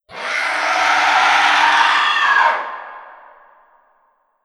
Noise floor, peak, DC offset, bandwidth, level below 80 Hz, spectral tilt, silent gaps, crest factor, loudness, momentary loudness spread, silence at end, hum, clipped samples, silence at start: -61 dBFS; 0 dBFS; under 0.1%; 13.5 kHz; -66 dBFS; 0.5 dB/octave; none; 16 dB; -14 LUFS; 12 LU; 1.3 s; none; under 0.1%; 0.1 s